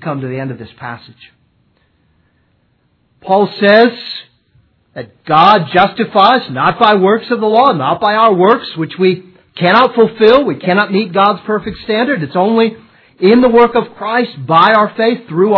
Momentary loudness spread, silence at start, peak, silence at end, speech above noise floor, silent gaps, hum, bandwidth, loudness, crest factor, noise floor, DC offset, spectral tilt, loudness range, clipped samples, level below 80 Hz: 16 LU; 0 s; 0 dBFS; 0 s; 47 dB; none; none; 5.4 kHz; -11 LUFS; 12 dB; -58 dBFS; under 0.1%; -8 dB/octave; 5 LU; 0.3%; -50 dBFS